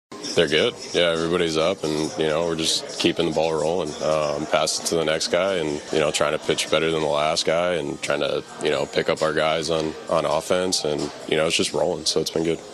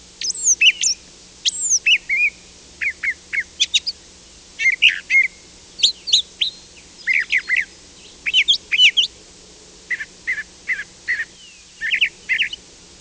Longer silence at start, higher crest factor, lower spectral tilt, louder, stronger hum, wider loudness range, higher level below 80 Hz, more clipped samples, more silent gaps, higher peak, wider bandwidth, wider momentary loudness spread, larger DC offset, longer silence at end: about the same, 0.1 s vs 0.2 s; about the same, 18 dB vs 18 dB; first, -3.5 dB/octave vs 3 dB/octave; second, -22 LUFS vs -17 LUFS; neither; second, 1 LU vs 6 LU; about the same, -52 dBFS vs -56 dBFS; neither; neither; about the same, -4 dBFS vs -2 dBFS; first, 13.5 kHz vs 8 kHz; second, 4 LU vs 14 LU; neither; second, 0 s vs 0.45 s